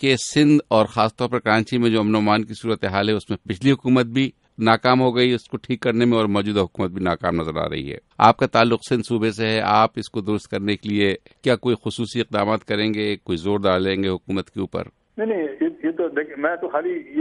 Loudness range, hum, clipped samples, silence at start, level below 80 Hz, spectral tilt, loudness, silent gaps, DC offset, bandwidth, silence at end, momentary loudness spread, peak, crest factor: 4 LU; none; under 0.1%; 0 s; -54 dBFS; -6 dB/octave; -21 LUFS; none; under 0.1%; 11.5 kHz; 0 s; 9 LU; 0 dBFS; 20 dB